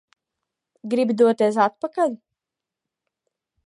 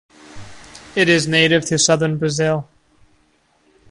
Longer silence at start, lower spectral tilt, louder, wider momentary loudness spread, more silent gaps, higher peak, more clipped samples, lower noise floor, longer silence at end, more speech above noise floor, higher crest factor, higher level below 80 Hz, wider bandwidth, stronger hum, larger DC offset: first, 0.85 s vs 0.3 s; first, -6 dB/octave vs -3.5 dB/octave; second, -21 LUFS vs -16 LUFS; first, 14 LU vs 7 LU; neither; second, -4 dBFS vs 0 dBFS; neither; first, -87 dBFS vs -59 dBFS; first, 1.5 s vs 1.25 s; first, 67 dB vs 43 dB; about the same, 20 dB vs 20 dB; second, -78 dBFS vs -52 dBFS; about the same, 11.5 kHz vs 11.5 kHz; neither; neither